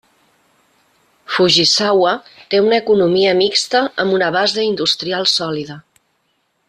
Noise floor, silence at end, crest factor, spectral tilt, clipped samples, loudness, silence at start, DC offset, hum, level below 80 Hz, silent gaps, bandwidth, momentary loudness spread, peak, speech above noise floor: -65 dBFS; 0.9 s; 16 dB; -3.5 dB/octave; under 0.1%; -14 LUFS; 1.3 s; under 0.1%; none; -60 dBFS; none; 13 kHz; 9 LU; -2 dBFS; 50 dB